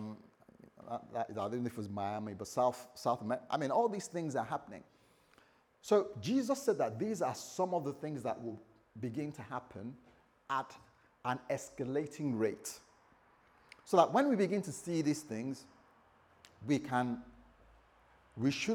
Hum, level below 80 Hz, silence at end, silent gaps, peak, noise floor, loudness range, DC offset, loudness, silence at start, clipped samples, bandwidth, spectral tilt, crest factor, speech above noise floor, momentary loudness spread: none; -74 dBFS; 0 s; none; -12 dBFS; -68 dBFS; 7 LU; under 0.1%; -36 LUFS; 0 s; under 0.1%; 19 kHz; -5.5 dB/octave; 26 dB; 32 dB; 16 LU